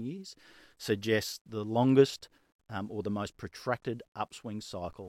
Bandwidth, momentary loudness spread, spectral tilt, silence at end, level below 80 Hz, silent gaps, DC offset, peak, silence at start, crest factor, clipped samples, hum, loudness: 16 kHz; 17 LU; -6 dB/octave; 0 s; -68 dBFS; 1.41-1.45 s, 2.52-2.59 s, 4.08-4.12 s; under 0.1%; -10 dBFS; 0 s; 22 dB; under 0.1%; none; -32 LUFS